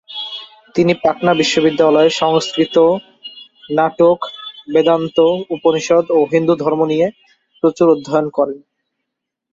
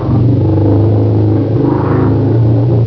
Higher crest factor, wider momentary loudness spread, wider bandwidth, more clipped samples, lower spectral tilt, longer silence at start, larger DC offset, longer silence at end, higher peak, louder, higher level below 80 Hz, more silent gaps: about the same, 14 dB vs 10 dB; first, 12 LU vs 2 LU; first, 7.8 kHz vs 5.4 kHz; neither; second, -5.5 dB/octave vs -12 dB/octave; about the same, 0.1 s vs 0 s; second, under 0.1% vs 1%; first, 0.95 s vs 0 s; about the same, 0 dBFS vs 0 dBFS; second, -15 LUFS vs -11 LUFS; second, -58 dBFS vs -28 dBFS; neither